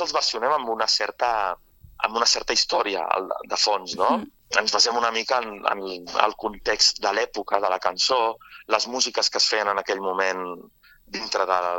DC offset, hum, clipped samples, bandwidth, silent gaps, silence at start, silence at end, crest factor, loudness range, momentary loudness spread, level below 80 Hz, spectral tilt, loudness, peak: under 0.1%; none; under 0.1%; 17.5 kHz; none; 0 s; 0 s; 22 dB; 2 LU; 9 LU; -56 dBFS; -0.5 dB/octave; -23 LUFS; -2 dBFS